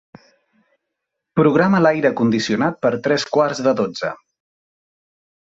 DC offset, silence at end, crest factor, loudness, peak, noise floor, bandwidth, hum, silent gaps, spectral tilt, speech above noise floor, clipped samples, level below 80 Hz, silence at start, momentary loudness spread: under 0.1%; 1.25 s; 18 dB; -18 LUFS; -2 dBFS; -79 dBFS; 8 kHz; none; none; -6 dB/octave; 62 dB; under 0.1%; -60 dBFS; 1.35 s; 10 LU